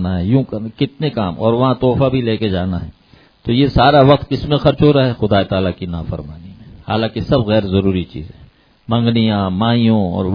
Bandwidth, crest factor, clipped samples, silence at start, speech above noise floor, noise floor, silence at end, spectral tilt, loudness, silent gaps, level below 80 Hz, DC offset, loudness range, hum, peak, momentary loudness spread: 5.2 kHz; 16 dB; under 0.1%; 0 s; 27 dB; -42 dBFS; 0 s; -9.5 dB/octave; -15 LUFS; none; -36 dBFS; under 0.1%; 5 LU; none; 0 dBFS; 14 LU